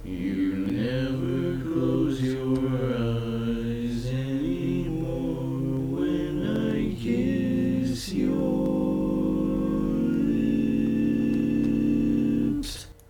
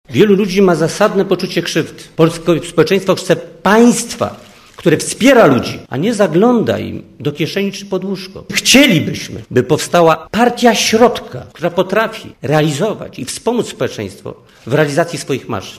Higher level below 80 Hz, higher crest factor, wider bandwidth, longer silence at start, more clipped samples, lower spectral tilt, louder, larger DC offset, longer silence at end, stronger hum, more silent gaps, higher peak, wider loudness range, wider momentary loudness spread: about the same, -42 dBFS vs -46 dBFS; about the same, 12 dB vs 14 dB; first, 18.5 kHz vs 15.5 kHz; about the same, 0 s vs 0.1 s; second, under 0.1% vs 0.2%; first, -7.5 dB/octave vs -4.5 dB/octave; second, -26 LUFS vs -13 LUFS; neither; first, 0.2 s vs 0 s; neither; neither; second, -14 dBFS vs 0 dBFS; about the same, 4 LU vs 6 LU; second, 5 LU vs 14 LU